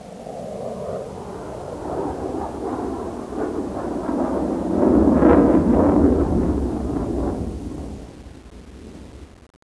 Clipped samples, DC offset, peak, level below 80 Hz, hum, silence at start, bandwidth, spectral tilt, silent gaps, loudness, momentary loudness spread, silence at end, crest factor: under 0.1%; under 0.1%; 0 dBFS; -34 dBFS; none; 0 s; 11 kHz; -8.5 dB/octave; none; -21 LUFS; 23 LU; 0.4 s; 22 dB